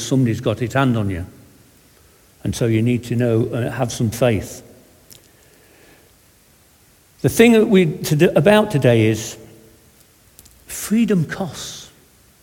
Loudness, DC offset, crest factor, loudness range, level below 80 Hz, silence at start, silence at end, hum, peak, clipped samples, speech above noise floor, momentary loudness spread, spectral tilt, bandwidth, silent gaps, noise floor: -17 LUFS; under 0.1%; 20 dB; 9 LU; -48 dBFS; 0 s; 0.55 s; none; 0 dBFS; under 0.1%; 36 dB; 17 LU; -6 dB/octave; 18.5 kHz; none; -53 dBFS